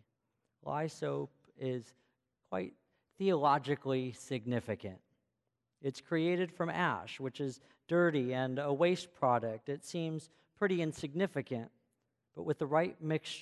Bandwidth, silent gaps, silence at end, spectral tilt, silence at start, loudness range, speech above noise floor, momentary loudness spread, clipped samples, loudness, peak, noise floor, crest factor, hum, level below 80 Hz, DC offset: 12 kHz; none; 0 s; -6.5 dB/octave; 0.65 s; 4 LU; 51 dB; 12 LU; under 0.1%; -36 LUFS; -16 dBFS; -86 dBFS; 20 dB; none; -74 dBFS; under 0.1%